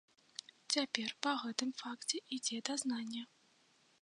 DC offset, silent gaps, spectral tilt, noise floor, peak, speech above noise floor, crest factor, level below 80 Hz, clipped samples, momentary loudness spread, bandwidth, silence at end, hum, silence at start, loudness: under 0.1%; none; -1 dB/octave; -71 dBFS; -12 dBFS; 32 dB; 30 dB; under -90 dBFS; under 0.1%; 15 LU; 11 kHz; 0.75 s; none; 0.7 s; -39 LUFS